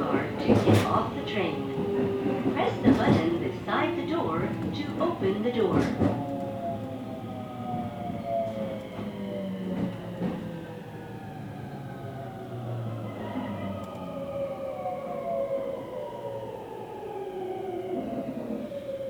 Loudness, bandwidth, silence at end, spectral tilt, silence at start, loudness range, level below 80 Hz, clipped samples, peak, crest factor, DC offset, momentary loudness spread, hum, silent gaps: -30 LUFS; over 20 kHz; 0 s; -7.5 dB/octave; 0 s; 10 LU; -56 dBFS; under 0.1%; -8 dBFS; 22 dB; under 0.1%; 14 LU; none; none